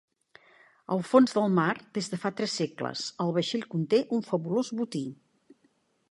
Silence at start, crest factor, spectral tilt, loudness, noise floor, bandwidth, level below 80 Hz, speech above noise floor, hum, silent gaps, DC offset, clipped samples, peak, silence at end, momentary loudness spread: 0.9 s; 22 dB; -5.5 dB/octave; -28 LUFS; -69 dBFS; 11.5 kHz; -76 dBFS; 42 dB; none; none; under 0.1%; under 0.1%; -6 dBFS; 1 s; 11 LU